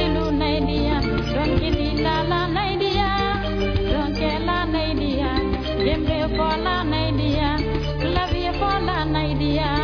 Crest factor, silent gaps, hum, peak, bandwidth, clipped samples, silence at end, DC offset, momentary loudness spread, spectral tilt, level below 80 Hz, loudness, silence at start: 12 dB; none; none; -8 dBFS; 5.4 kHz; under 0.1%; 0 s; under 0.1%; 2 LU; -7.5 dB/octave; -28 dBFS; -22 LUFS; 0 s